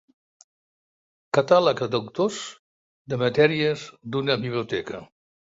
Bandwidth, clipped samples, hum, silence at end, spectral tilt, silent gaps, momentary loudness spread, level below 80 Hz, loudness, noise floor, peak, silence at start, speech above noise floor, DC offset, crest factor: 8 kHz; under 0.1%; none; 0.55 s; -5.5 dB/octave; 2.59-3.05 s; 14 LU; -64 dBFS; -23 LUFS; under -90 dBFS; -4 dBFS; 1.35 s; over 67 dB; under 0.1%; 22 dB